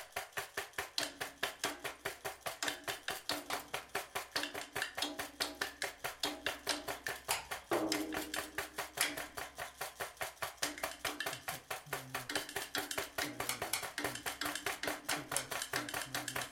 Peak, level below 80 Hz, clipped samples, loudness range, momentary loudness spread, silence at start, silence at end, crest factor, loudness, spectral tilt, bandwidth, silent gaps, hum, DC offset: -14 dBFS; -68 dBFS; under 0.1%; 2 LU; 6 LU; 0 s; 0 s; 28 dB; -39 LUFS; -1.5 dB/octave; 16.5 kHz; none; none; under 0.1%